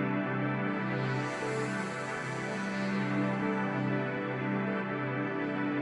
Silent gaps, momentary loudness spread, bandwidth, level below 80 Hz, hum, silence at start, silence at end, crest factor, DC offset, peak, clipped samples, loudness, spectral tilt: none; 4 LU; 11 kHz; -72 dBFS; none; 0 s; 0 s; 14 dB; under 0.1%; -18 dBFS; under 0.1%; -33 LUFS; -6.5 dB/octave